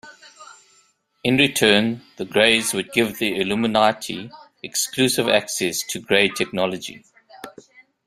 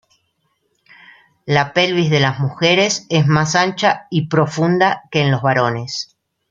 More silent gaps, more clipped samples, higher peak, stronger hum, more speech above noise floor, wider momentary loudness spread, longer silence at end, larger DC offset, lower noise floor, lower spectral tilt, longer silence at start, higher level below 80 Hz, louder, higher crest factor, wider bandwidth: neither; neither; about the same, 0 dBFS vs 0 dBFS; neither; second, 40 dB vs 51 dB; first, 18 LU vs 6 LU; first, 0.6 s vs 0.45 s; neither; second, -61 dBFS vs -67 dBFS; second, -3 dB/octave vs -5 dB/octave; second, 0.05 s vs 1.45 s; about the same, -60 dBFS vs -56 dBFS; second, -19 LUFS vs -16 LUFS; first, 22 dB vs 16 dB; first, 16 kHz vs 7.8 kHz